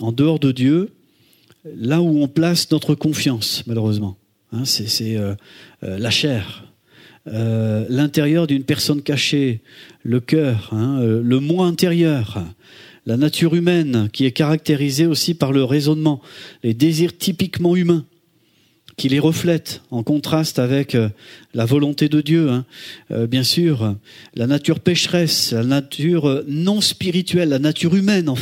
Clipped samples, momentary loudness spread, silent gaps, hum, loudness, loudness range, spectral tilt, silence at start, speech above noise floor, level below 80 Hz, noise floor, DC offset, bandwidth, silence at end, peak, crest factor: under 0.1%; 11 LU; none; none; -18 LUFS; 3 LU; -5.5 dB/octave; 0 s; 41 dB; -58 dBFS; -58 dBFS; under 0.1%; 16.5 kHz; 0 s; -2 dBFS; 18 dB